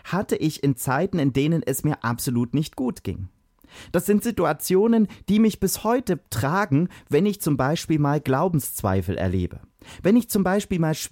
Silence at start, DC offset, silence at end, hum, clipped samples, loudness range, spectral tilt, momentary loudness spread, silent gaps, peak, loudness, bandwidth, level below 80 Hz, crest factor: 0.05 s; under 0.1%; 0.05 s; none; under 0.1%; 3 LU; -6 dB/octave; 7 LU; none; -8 dBFS; -23 LUFS; 17 kHz; -48 dBFS; 14 dB